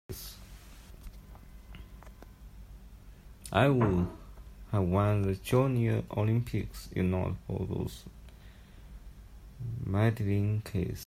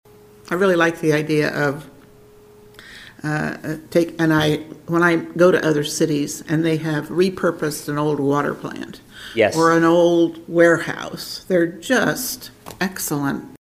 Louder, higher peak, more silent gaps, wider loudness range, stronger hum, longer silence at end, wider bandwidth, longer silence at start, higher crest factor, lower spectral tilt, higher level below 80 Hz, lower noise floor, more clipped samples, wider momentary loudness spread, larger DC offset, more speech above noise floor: second, -30 LUFS vs -19 LUFS; second, -12 dBFS vs 0 dBFS; neither; first, 8 LU vs 5 LU; neither; about the same, 0 s vs 0.05 s; about the same, 15.5 kHz vs 16 kHz; second, 0.1 s vs 0.45 s; about the same, 20 dB vs 18 dB; first, -7.5 dB/octave vs -5 dB/octave; about the same, -50 dBFS vs -54 dBFS; first, -51 dBFS vs -47 dBFS; neither; first, 25 LU vs 14 LU; neither; second, 22 dB vs 28 dB